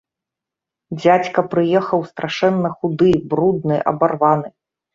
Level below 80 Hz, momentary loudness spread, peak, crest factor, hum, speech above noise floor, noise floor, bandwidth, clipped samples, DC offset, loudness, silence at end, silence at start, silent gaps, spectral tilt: -52 dBFS; 6 LU; 0 dBFS; 18 dB; none; 69 dB; -85 dBFS; 7.4 kHz; under 0.1%; under 0.1%; -17 LUFS; 0.45 s; 0.9 s; none; -7.5 dB/octave